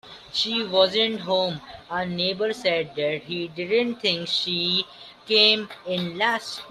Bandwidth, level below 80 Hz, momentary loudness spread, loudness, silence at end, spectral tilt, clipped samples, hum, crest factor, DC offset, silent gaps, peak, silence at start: 13.5 kHz; -64 dBFS; 11 LU; -23 LUFS; 0 s; -4 dB/octave; under 0.1%; none; 22 dB; under 0.1%; none; -2 dBFS; 0.05 s